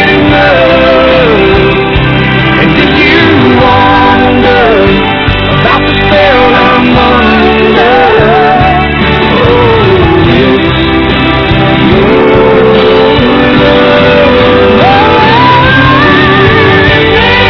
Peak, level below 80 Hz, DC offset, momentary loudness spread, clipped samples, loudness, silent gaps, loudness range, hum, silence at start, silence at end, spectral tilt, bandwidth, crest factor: 0 dBFS; -20 dBFS; under 0.1%; 3 LU; 10%; -4 LUFS; none; 2 LU; none; 0 s; 0 s; -7.5 dB/octave; 5.4 kHz; 4 dB